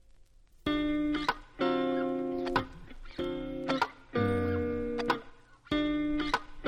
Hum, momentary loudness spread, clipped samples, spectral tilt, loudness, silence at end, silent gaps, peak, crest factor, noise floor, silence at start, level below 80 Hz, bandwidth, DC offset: none; 7 LU; under 0.1%; -6.5 dB/octave; -32 LUFS; 0 s; none; -14 dBFS; 18 dB; -58 dBFS; 0.65 s; -50 dBFS; 13.5 kHz; under 0.1%